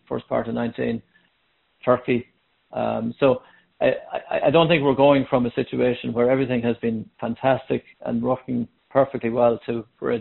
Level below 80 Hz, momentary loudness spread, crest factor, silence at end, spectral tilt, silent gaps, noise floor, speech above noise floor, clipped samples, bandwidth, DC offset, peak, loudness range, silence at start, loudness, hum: -56 dBFS; 11 LU; 20 dB; 0 s; -5 dB/octave; none; -67 dBFS; 46 dB; under 0.1%; 4.2 kHz; under 0.1%; -4 dBFS; 5 LU; 0.1 s; -22 LUFS; none